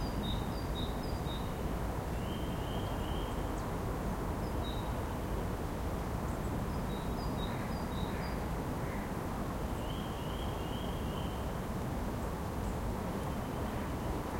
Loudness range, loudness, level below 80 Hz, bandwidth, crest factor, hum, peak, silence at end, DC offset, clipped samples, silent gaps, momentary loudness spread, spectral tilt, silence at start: 1 LU; -38 LUFS; -42 dBFS; 16.5 kHz; 14 dB; none; -22 dBFS; 0 s; under 0.1%; under 0.1%; none; 1 LU; -6 dB/octave; 0 s